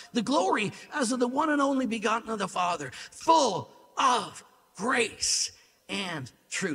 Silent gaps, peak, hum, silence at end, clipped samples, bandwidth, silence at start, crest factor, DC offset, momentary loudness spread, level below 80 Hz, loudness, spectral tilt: none; -10 dBFS; none; 0 s; under 0.1%; 15.5 kHz; 0 s; 20 dB; under 0.1%; 11 LU; -68 dBFS; -28 LUFS; -3 dB/octave